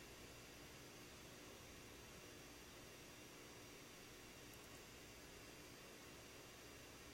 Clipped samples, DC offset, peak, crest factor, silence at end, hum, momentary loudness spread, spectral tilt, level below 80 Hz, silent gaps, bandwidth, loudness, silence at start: under 0.1%; under 0.1%; -42 dBFS; 18 dB; 0 s; none; 0 LU; -3 dB/octave; -72 dBFS; none; 16 kHz; -58 LUFS; 0 s